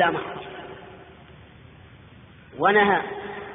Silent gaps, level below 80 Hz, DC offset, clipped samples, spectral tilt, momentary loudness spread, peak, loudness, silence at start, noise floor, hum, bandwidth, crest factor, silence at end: none; -58 dBFS; under 0.1%; under 0.1%; -2.5 dB/octave; 26 LU; -6 dBFS; -22 LUFS; 0 s; -48 dBFS; none; 3.9 kHz; 20 dB; 0 s